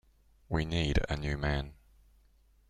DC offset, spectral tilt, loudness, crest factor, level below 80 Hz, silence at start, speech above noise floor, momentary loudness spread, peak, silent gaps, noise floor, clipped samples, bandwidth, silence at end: under 0.1%; -6 dB/octave; -33 LUFS; 22 dB; -40 dBFS; 0.5 s; 33 dB; 6 LU; -12 dBFS; none; -65 dBFS; under 0.1%; 10.5 kHz; 0.95 s